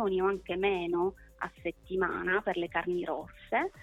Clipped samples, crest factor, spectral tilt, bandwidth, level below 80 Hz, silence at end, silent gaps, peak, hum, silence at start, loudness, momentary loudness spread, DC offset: under 0.1%; 16 dB; -6.5 dB/octave; 8.2 kHz; -56 dBFS; 0 s; none; -16 dBFS; none; 0 s; -32 LUFS; 9 LU; under 0.1%